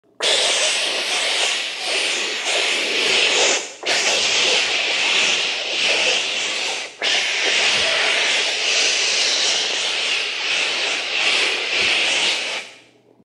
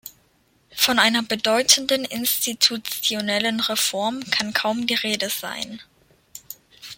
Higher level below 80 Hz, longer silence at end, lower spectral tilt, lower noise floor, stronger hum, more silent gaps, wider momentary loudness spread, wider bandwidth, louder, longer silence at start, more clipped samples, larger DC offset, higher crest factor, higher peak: about the same, -66 dBFS vs -64 dBFS; first, 0.5 s vs 0.05 s; second, 1.5 dB/octave vs -1 dB/octave; second, -50 dBFS vs -62 dBFS; neither; neither; second, 5 LU vs 18 LU; second, 15 kHz vs 17 kHz; first, -17 LUFS vs -20 LUFS; first, 0.2 s vs 0.05 s; neither; neither; second, 16 dB vs 22 dB; second, -4 dBFS vs 0 dBFS